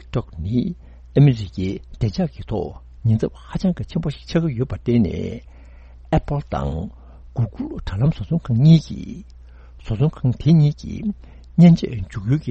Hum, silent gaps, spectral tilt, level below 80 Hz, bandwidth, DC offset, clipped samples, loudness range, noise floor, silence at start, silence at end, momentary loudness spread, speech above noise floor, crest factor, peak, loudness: none; none; -9 dB/octave; -36 dBFS; 7.4 kHz; under 0.1%; under 0.1%; 5 LU; -42 dBFS; 0 s; 0 s; 16 LU; 23 dB; 20 dB; 0 dBFS; -20 LUFS